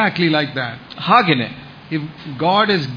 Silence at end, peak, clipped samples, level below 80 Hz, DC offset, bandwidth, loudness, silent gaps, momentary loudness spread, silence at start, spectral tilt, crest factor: 0 s; 0 dBFS; under 0.1%; -56 dBFS; under 0.1%; 5.2 kHz; -17 LUFS; none; 14 LU; 0 s; -7 dB/octave; 18 dB